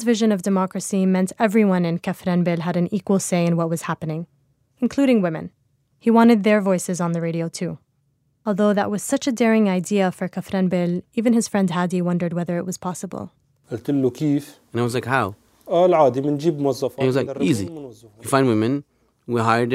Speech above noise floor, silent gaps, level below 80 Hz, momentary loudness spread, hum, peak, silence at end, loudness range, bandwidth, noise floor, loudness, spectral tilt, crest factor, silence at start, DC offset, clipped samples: 46 dB; none; -64 dBFS; 12 LU; none; -2 dBFS; 0 s; 3 LU; 15.5 kHz; -66 dBFS; -21 LUFS; -6 dB/octave; 18 dB; 0 s; under 0.1%; under 0.1%